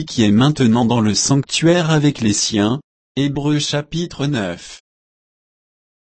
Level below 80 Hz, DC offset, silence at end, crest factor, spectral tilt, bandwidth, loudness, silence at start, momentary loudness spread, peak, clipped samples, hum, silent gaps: -48 dBFS; under 0.1%; 1.3 s; 14 dB; -5 dB/octave; 8.8 kHz; -16 LUFS; 0 s; 11 LU; -2 dBFS; under 0.1%; none; 2.84-3.15 s